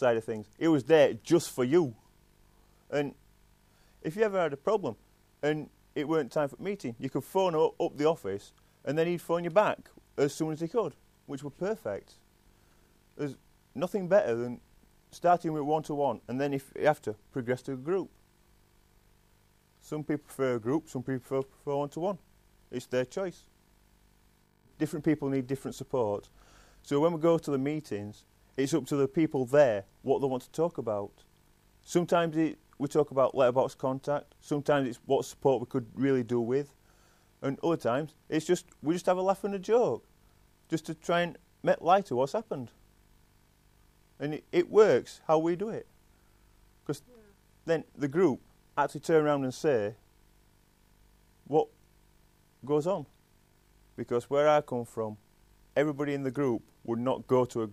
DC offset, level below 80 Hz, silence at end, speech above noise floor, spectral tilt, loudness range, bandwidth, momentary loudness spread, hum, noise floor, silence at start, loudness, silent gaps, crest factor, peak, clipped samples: under 0.1%; -66 dBFS; 0 s; 36 dB; -6.5 dB/octave; 6 LU; 15 kHz; 13 LU; 50 Hz at -65 dBFS; -65 dBFS; 0 s; -30 LUFS; none; 20 dB; -10 dBFS; under 0.1%